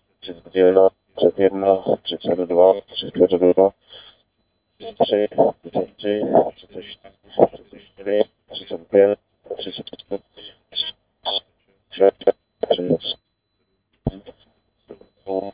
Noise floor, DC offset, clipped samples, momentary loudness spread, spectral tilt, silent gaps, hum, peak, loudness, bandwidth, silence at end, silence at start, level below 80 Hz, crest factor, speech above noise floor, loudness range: -71 dBFS; under 0.1%; under 0.1%; 19 LU; -9.5 dB/octave; none; none; 0 dBFS; -20 LUFS; 4 kHz; 0.05 s; 0.25 s; -52 dBFS; 20 dB; 52 dB; 6 LU